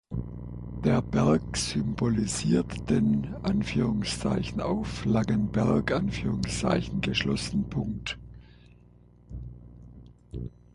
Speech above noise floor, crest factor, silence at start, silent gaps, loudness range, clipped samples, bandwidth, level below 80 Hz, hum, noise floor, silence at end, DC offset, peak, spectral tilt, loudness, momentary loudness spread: 28 dB; 18 dB; 0.1 s; none; 6 LU; under 0.1%; 11.5 kHz; -44 dBFS; 60 Hz at -40 dBFS; -55 dBFS; 0.25 s; under 0.1%; -10 dBFS; -5.5 dB/octave; -28 LUFS; 15 LU